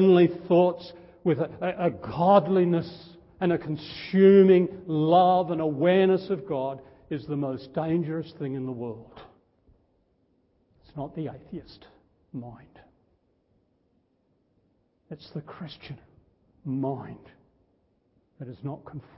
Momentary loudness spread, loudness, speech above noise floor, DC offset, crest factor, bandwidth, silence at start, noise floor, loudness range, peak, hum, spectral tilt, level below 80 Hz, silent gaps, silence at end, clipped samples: 23 LU; -24 LUFS; 45 dB; under 0.1%; 22 dB; 5.8 kHz; 0 s; -70 dBFS; 21 LU; -6 dBFS; none; -11.5 dB/octave; -62 dBFS; none; 0.15 s; under 0.1%